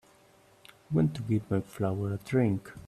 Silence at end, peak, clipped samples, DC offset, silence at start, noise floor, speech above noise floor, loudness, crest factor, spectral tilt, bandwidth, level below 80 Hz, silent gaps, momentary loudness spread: 0.05 s; -14 dBFS; under 0.1%; under 0.1%; 0.9 s; -61 dBFS; 31 dB; -30 LUFS; 16 dB; -8.5 dB/octave; 13.5 kHz; -62 dBFS; none; 5 LU